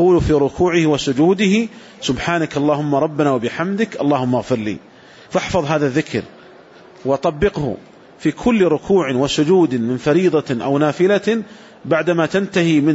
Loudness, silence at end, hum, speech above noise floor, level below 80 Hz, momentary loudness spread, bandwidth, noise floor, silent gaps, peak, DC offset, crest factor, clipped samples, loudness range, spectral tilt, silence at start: -17 LUFS; 0 s; none; 26 dB; -42 dBFS; 9 LU; 8 kHz; -43 dBFS; none; -4 dBFS; under 0.1%; 12 dB; under 0.1%; 5 LU; -6 dB/octave; 0 s